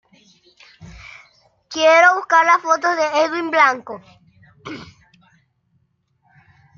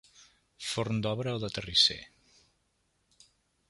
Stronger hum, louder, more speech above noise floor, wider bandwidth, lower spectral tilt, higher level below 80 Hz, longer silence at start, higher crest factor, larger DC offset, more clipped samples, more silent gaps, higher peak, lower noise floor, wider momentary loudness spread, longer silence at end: neither; first, -15 LUFS vs -29 LUFS; first, 49 dB vs 45 dB; second, 7.2 kHz vs 11.5 kHz; about the same, -2.5 dB/octave vs -3.5 dB/octave; about the same, -58 dBFS vs -60 dBFS; first, 0.8 s vs 0.6 s; second, 18 dB vs 26 dB; neither; neither; neither; first, -2 dBFS vs -10 dBFS; second, -65 dBFS vs -75 dBFS; first, 25 LU vs 14 LU; first, 1.95 s vs 1.65 s